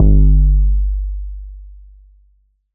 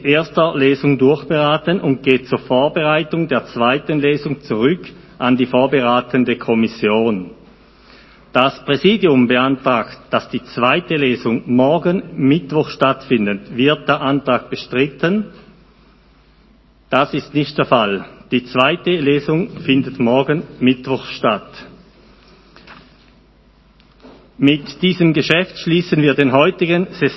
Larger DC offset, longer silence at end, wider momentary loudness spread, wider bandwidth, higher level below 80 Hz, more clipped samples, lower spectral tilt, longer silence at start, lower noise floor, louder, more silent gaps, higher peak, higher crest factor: neither; first, 1 s vs 0 s; first, 21 LU vs 7 LU; second, 0.8 kHz vs 6 kHz; first, -14 dBFS vs -50 dBFS; neither; first, -19 dB/octave vs -7.5 dB/octave; about the same, 0 s vs 0 s; first, -56 dBFS vs -50 dBFS; about the same, -16 LUFS vs -16 LUFS; neither; about the same, 0 dBFS vs 0 dBFS; about the same, 14 dB vs 16 dB